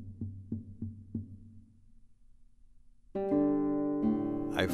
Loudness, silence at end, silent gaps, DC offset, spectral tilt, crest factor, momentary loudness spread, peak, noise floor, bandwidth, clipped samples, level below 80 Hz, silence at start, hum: -34 LUFS; 0 s; none; under 0.1%; -7 dB/octave; 22 dB; 15 LU; -12 dBFS; -58 dBFS; 13 kHz; under 0.1%; -58 dBFS; 0 s; none